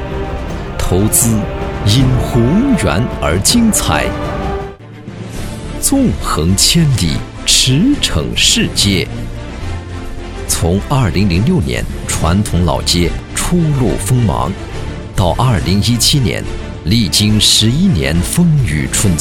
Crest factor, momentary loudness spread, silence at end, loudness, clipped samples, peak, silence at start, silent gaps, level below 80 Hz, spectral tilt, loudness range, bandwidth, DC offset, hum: 14 dB; 15 LU; 0 s; -13 LUFS; under 0.1%; 0 dBFS; 0 s; none; -24 dBFS; -4 dB/octave; 4 LU; 18 kHz; under 0.1%; none